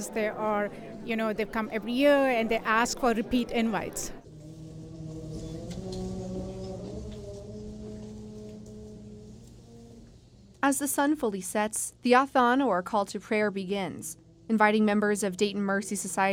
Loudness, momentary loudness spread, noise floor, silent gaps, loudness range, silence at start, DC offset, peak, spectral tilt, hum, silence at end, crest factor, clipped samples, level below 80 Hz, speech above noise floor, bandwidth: -28 LUFS; 20 LU; -54 dBFS; none; 14 LU; 0 s; under 0.1%; -8 dBFS; -4.5 dB/octave; none; 0 s; 22 dB; under 0.1%; -52 dBFS; 27 dB; 18 kHz